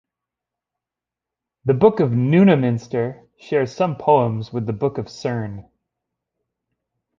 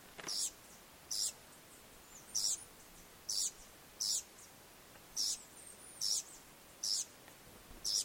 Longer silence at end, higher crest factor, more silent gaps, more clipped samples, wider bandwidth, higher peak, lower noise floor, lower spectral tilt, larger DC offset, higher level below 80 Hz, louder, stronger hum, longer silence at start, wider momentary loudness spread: first, 1.6 s vs 0 s; about the same, 20 dB vs 20 dB; neither; neither; second, 7.4 kHz vs 16.5 kHz; first, -2 dBFS vs -22 dBFS; first, -87 dBFS vs -59 dBFS; first, -8.5 dB/octave vs 1 dB/octave; neither; first, -56 dBFS vs -70 dBFS; first, -19 LUFS vs -38 LUFS; neither; first, 1.65 s vs 0 s; second, 13 LU vs 20 LU